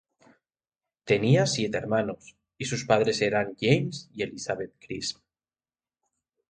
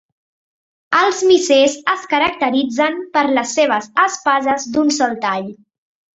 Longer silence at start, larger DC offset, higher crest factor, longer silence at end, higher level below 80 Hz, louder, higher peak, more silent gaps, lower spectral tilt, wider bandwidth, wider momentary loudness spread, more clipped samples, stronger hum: first, 1.05 s vs 0.9 s; neither; first, 22 dB vs 16 dB; first, 1.4 s vs 0.6 s; about the same, -62 dBFS vs -58 dBFS; second, -27 LUFS vs -16 LUFS; second, -6 dBFS vs 0 dBFS; neither; first, -5 dB/octave vs -2.5 dB/octave; first, 9.4 kHz vs 8.2 kHz; first, 12 LU vs 6 LU; neither; neither